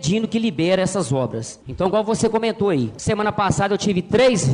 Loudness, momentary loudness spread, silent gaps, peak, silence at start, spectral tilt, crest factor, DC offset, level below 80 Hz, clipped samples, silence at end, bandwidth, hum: -20 LUFS; 6 LU; none; -6 dBFS; 0 s; -5.5 dB/octave; 14 dB; under 0.1%; -46 dBFS; under 0.1%; 0 s; 10.5 kHz; none